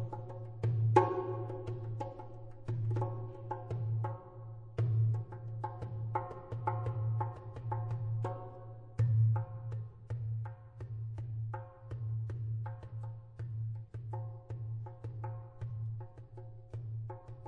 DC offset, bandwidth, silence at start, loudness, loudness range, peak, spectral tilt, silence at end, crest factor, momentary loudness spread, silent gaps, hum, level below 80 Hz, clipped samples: under 0.1%; 4.1 kHz; 0 s; -38 LUFS; 8 LU; -12 dBFS; -9.5 dB/octave; 0 s; 26 dB; 14 LU; none; none; -60 dBFS; under 0.1%